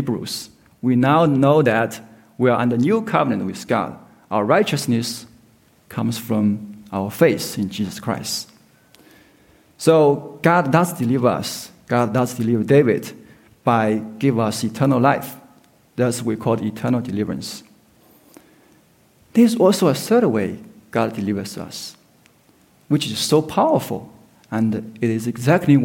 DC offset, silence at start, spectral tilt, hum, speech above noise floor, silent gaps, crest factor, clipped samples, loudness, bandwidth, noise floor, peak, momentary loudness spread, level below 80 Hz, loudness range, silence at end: under 0.1%; 0 s; -6 dB/octave; none; 37 dB; none; 18 dB; under 0.1%; -19 LUFS; 17 kHz; -55 dBFS; -2 dBFS; 14 LU; -60 dBFS; 5 LU; 0 s